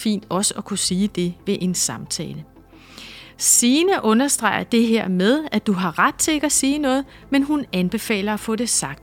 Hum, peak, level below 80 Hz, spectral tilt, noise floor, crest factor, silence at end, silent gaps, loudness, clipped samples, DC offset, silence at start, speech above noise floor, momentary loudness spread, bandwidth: none; -2 dBFS; -50 dBFS; -3.5 dB/octave; -43 dBFS; 18 dB; 0.1 s; none; -19 LUFS; under 0.1%; under 0.1%; 0 s; 23 dB; 10 LU; 17.5 kHz